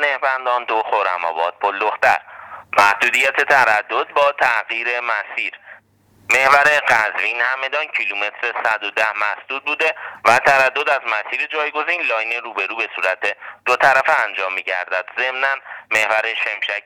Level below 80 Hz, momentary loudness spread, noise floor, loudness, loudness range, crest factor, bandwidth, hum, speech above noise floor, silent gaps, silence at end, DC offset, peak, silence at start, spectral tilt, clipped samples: -62 dBFS; 9 LU; -53 dBFS; -17 LUFS; 2 LU; 18 dB; 20 kHz; none; 35 dB; none; 0.05 s; under 0.1%; 0 dBFS; 0 s; -1.5 dB/octave; under 0.1%